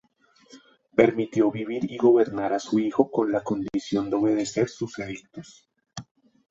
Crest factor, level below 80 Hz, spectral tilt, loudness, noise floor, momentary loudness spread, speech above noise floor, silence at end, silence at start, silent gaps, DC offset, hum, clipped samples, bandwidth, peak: 22 dB; -62 dBFS; -6 dB/octave; -24 LUFS; -60 dBFS; 21 LU; 36 dB; 0.5 s; 0.55 s; none; under 0.1%; none; under 0.1%; 7.8 kHz; -4 dBFS